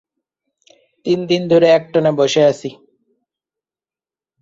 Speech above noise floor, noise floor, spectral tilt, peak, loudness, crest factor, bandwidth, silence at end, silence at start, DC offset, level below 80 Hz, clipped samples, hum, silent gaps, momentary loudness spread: over 76 dB; under -90 dBFS; -5.5 dB/octave; -2 dBFS; -15 LUFS; 16 dB; 7.8 kHz; 1.7 s; 1.05 s; under 0.1%; -60 dBFS; under 0.1%; none; none; 15 LU